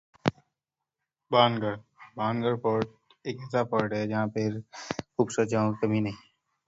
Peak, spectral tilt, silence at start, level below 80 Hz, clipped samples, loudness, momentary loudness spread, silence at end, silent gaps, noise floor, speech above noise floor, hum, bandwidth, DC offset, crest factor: -4 dBFS; -6 dB/octave; 0.25 s; -64 dBFS; under 0.1%; -29 LUFS; 14 LU; 0.5 s; none; -88 dBFS; 60 dB; none; 8 kHz; under 0.1%; 24 dB